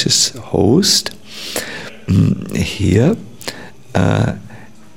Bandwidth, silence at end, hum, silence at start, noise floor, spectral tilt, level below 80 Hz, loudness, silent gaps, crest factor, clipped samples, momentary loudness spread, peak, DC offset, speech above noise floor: 17 kHz; 0.3 s; none; 0 s; -39 dBFS; -4.5 dB/octave; -40 dBFS; -15 LUFS; none; 16 dB; under 0.1%; 16 LU; 0 dBFS; 1%; 25 dB